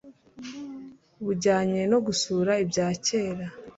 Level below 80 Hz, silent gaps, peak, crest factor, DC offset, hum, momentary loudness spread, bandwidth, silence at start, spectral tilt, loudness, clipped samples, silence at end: -62 dBFS; none; -10 dBFS; 16 dB; under 0.1%; none; 17 LU; 8 kHz; 0.05 s; -4.5 dB/octave; -26 LUFS; under 0.1%; 0.05 s